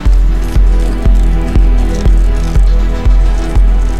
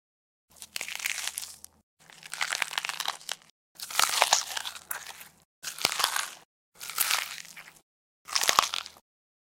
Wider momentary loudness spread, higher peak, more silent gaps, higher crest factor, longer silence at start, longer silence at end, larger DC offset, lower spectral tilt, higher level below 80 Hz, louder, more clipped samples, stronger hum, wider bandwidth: second, 1 LU vs 21 LU; about the same, 0 dBFS vs -2 dBFS; second, none vs 1.83-1.97 s, 3.51-3.75 s, 5.45-5.62 s, 6.45-6.72 s, 7.82-8.25 s; second, 8 dB vs 32 dB; second, 0 s vs 0.6 s; second, 0 s vs 0.5 s; first, 8% vs under 0.1%; first, -7 dB/octave vs 2 dB/octave; first, -8 dBFS vs -70 dBFS; first, -13 LUFS vs -29 LUFS; neither; neither; second, 8 kHz vs 17 kHz